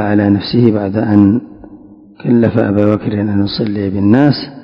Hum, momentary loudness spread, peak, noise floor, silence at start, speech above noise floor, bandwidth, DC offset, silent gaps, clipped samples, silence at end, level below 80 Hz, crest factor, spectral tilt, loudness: none; 6 LU; 0 dBFS; -38 dBFS; 0 s; 26 dB; 5.4 kHz; under 0.1%; none; 0.7%; 0 s; -40 dBFS; 12 dB; -10 dB/octave; -12 LUFS